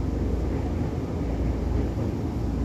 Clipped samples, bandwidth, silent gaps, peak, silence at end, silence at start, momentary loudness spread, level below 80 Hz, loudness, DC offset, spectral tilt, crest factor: under 0.1%; 8.2 kHz; none; -14 dBFS; 0 s; 0 s; 2 LU; -30 dBFS; -28 LUFS; under 0.1%; -8.5 dB/octave; 12 dB